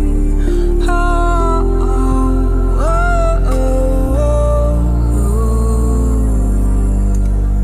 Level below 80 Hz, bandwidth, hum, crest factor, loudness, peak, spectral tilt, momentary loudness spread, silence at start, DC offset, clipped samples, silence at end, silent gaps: -12 dBFS; 11 kHz; none; 10 dB; -15 LUFS; -2 dBFS; -7.5 dB/octave; 2 LU; 0 s; under 0.1%; under 0.1%; 0 s; none